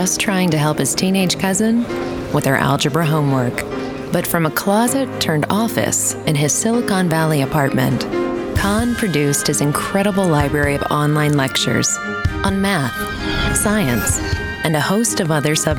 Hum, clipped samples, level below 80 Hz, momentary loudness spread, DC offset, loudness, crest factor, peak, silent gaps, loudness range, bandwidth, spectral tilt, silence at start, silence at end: none; under 0.1%; -36 dBFS; 5 LU; under 0.1%; -17 LUFS; 16 dB; 0 dBFS; none; 1 LU; over 20 kHz; -4.5 dB/octave; 0 s; 0 s